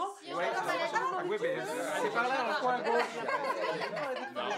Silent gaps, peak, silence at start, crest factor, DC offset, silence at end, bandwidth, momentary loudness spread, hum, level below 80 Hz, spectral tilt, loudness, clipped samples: none; -16 dBFS; 0 s; 16 dB; under 0.1%; 0 s; 16 kHz; 5 LU; none; under -90 dBFS; -3.5 dB/octave; -33 LUFS; under 0.1%